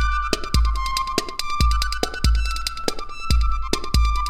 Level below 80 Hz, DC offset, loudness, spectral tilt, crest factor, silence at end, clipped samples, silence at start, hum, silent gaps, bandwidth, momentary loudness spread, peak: -22 dBFS; under 0.1%; -23 LUFS; -4 dB/octave; 18 dB; 0 s; under 0.1%; 0 s; none; none; 15.5 kHz; 5 LU; -2 dBFS